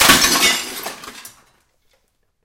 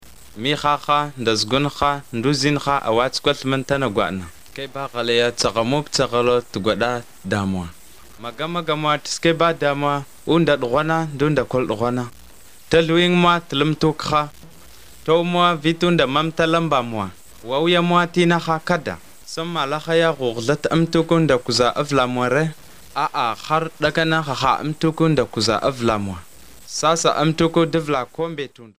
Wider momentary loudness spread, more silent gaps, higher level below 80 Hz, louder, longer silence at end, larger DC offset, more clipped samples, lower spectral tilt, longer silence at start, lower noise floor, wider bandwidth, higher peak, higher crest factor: first, 24 LU vs 10 LU; neither; about the same, -44 dBFS vs -48 dBFS; first, -13 LUFS vs -19 LUFS; first, 1.15 s vs 0 s; second, under 0.1% vs 0.7%; neither; second, -0.5 dB/octave vs -5 dB/octave; about the same, 0 s vs 0 s; first, -65 dBFS vs -47 dBFS; about the same, 17 kHz vs 16 kHz; about the same, 0 dBFS vs 0 dBFS; about the same, 20 dB vs 18 dB